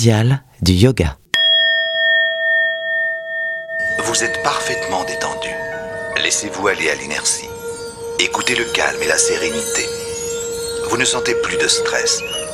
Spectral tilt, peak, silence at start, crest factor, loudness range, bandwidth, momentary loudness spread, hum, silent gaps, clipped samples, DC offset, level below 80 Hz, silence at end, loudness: -3 dB/octave; 0 dBFS; 0 s; 18 dB; 5 LU; 15.5 kHz; 9 LU; none; none; under 0.1%; under 0.1%; -40 dBFS; 0 s; -16 LUFS